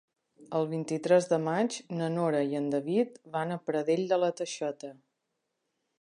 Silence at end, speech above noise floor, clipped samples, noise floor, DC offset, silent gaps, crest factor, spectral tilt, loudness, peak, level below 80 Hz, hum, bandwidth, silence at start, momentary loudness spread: 1.1 s; 53 dB; under 0.1%; -82 dBFS; under 0.1%; none; 20 dB; -6 dB/octave; -30 LUFS; -12 dBFS; -82 dBFS; none; 11 kHz; 0.4 s; 9 LU